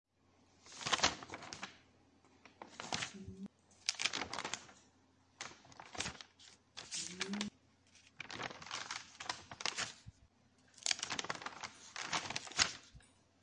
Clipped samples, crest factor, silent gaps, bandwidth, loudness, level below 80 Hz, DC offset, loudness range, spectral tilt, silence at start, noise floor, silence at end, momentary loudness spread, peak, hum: under 0.1%; 34 dB; none; 11.5 kHz; -41 LUFS; -72 dBFS; under 0.1%; 6 LU; -1 dB/octave; 0.6 s; -72 dBFS; 0.35 s; 19 LU; -10 dBFS; none